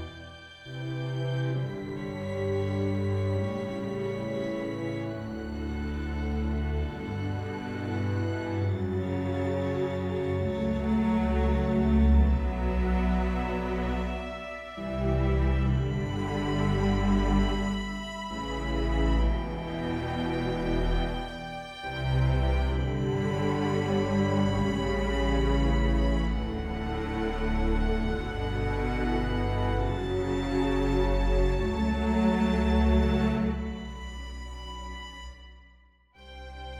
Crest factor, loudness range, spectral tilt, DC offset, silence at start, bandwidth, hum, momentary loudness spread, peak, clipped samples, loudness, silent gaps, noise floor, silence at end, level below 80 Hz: 16 dB; 6 LU; -7.5 dB/octave; under 0.1%; 0 s; 11 kHz; none; 10 LU; -12 dBFS; under 0.1%; -29 LUFS; none; -59 dBFS; 0 s; -32 dBFS